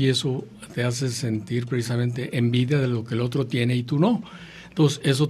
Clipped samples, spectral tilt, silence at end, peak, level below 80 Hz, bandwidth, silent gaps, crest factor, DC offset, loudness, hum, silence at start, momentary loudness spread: under 0.1%; -6 dB/octave; 0 s; -6 dBFS; -58 dBFS; 13.5 kHz; none; 18 dB; under 0.1%; -24 LUFS; none; 0 s; 8 LU